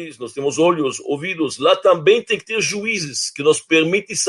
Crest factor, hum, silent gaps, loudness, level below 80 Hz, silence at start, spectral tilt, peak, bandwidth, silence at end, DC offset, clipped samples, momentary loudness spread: 18 dB; none; none; -18 LUFS; -66 dBFS; 0 s; -3 dB/octave; 0 dBFS; 11.5 kHz; 0 s; under 0.1%; under 0.1%; 9 LU